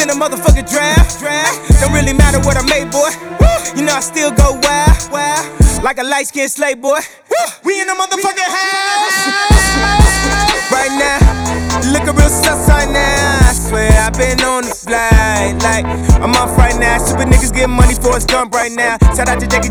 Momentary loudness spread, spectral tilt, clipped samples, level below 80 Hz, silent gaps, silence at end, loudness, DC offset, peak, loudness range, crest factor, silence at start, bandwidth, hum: 5 LU; -4 dB/octave; under 0.1%; -16 dBFS; none; 0 s; -12 LUFS; under 0.1%; 0 dBFS; 3 LU; 10 dB; 0 s; over 20 kHz; none